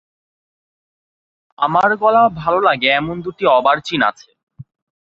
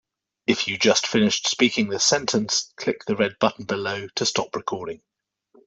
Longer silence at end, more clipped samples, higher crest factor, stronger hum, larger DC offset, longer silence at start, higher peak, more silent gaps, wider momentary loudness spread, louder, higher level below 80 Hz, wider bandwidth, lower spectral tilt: second, 0.45 s vs 0.7 s; neither; about the same, 16 dB vs 20 dB; neither; neither; first, 1.6 s vs 0.5 s; about the same, -2 dBFS vs -4 dBFS; first, 4.43-4.47 s vs none; second, 6 LU vs 10 LU; first, -15 LUFS vs -22 LUFS; first, -54 dBFS vs -62 dBFS; about the same, 7.6 kHz vs 8.2 kHz; first, -5.5 dB/octave vs -2.5 dB/octave